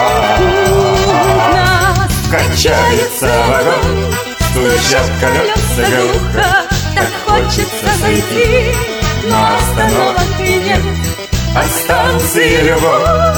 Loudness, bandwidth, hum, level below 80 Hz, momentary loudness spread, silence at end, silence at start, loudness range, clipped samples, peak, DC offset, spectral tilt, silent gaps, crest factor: -11 LUFS; over 20 kHz; none; -22 dBFS; 5 LU; 0 s; 0 s; 2 LU; under 0.1%; 0 dBFS; under 0.1%; -4 dB/octave; none; 12 dB